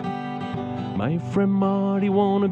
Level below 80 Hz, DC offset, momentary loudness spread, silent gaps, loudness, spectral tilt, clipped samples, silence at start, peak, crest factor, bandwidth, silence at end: -58 dBFS; under 0.1%; 9 LU; none; -23 LUFS; -9 dB/octave; under 0.1%; 0 s; -8 dBFS; 14 dB; 7.2 kHz; 0 s